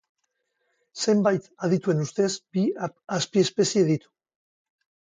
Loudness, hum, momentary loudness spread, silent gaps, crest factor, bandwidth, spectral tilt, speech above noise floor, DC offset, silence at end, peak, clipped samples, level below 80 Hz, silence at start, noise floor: -25 LUFS; none; 7 LU; none; 18 dB; 9.6 kHz; -5 dB/octave; 53 dB; under 0.1%; 1.2 s; -8 dBFS; under 0.1%; -70 dBFS; 0.95 s; -76 dBFS